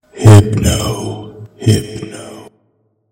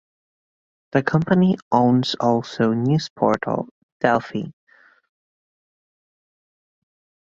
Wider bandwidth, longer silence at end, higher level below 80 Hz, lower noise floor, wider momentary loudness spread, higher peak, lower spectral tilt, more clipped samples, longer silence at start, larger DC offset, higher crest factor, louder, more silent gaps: first, 16.5 kHz vs 7.6 kHz; second, 0.7 s vs 2.7 s; first, -34 dBFS vs -58 dBFS; second, -60 dBFS vs under -90 dBFS; first, 23 LU vs 11 LU; about the same, 0 dBFS vs -2 dBFS; about the same, -6 dB/octave vs -7 dB/octave; first, 3% vs under 0.1%; second, 0.15 s vs 0.95 s; neither; second, 14 dB vs 20 dB; first, -11 LUFS vs -20 LUFS; second, none vs 1.62-1.71 s, 3.10-3.16 s, 3.71-4.00 s